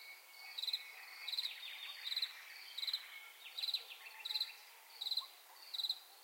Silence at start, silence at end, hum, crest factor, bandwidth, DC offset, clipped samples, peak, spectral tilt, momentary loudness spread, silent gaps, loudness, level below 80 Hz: 0 s; 0 s; none; 18 dB; 16.5 kHz; under 0.1%; under 0.1%; -28 dBFS; 6 dB/octave; 12 LU; none; -42 LUFS; under -90 dBFS